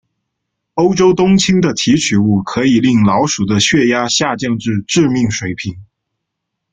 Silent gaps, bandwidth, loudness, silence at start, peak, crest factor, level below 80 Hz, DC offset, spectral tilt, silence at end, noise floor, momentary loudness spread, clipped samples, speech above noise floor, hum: none; 9.4 kHz; -13 LUFS; 0.75 s; 0 dBFS; 14 dB; -46 dBFS; under 0.1%; -4.5 dB/octave; 0.9 s; -75 dBFS; 7 LU; under 0.1%; 63 dB; none